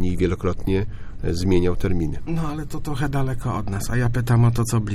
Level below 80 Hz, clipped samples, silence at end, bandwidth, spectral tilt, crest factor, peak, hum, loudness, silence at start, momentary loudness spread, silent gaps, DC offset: -30 dBFS; under 0.1%; 0 s; 14.5 kHz; -7 dB/octave; 16 dB; -4 dBFS; none; -23 LUFS; 0 s; 10 LU; none; under 0.1%